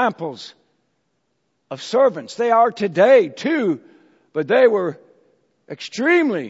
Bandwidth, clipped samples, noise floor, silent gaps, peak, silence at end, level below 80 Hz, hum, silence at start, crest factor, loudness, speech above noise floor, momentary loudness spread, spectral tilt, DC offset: 8 kHz; under 0.1%; -70 dBFS; none; -2 dBFS; 0 s; -76 dBFS; none; 0 s; 18 dB; -18 LUFS; 53 dB; 19 LU; -5.5 dB/octave; under 0.1%